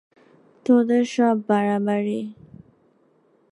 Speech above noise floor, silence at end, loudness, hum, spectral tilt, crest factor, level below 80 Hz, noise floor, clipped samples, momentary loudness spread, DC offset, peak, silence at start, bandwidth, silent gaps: 41 dB; 1.2 s; -21 LUFS; none; -7 dB/octave; 16 dB; -70 dBFS; -61 dBFS; under 0.1%; 13 LU; under 0.1%; -6 dBFS; 0.7 s; 10.5 kHz; none